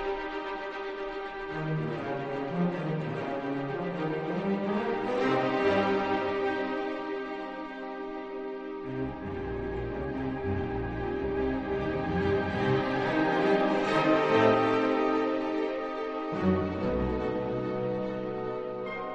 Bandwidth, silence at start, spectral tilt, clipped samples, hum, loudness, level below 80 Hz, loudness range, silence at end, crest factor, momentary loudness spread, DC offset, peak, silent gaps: 8.2 kHz; 0 s; -7.5 dB/octave; under 0.1%; none; -30 LUFS; -50 dBFS; 9 LU; 0 s; 20 dB; 11 LU; under 0.1%; -10 dBFS; none